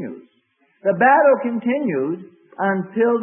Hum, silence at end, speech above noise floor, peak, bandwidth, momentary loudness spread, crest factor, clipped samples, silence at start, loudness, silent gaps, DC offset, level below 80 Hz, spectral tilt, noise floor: none; 0 s; 46 dB; -4 dBFS; 3.4 kHz; 12 LU; 16 dB; under 0.1%; 0 s; -18 LUFS; none; under 0.1%; -74 dBFS; -12 dB/octave; -63 dBFS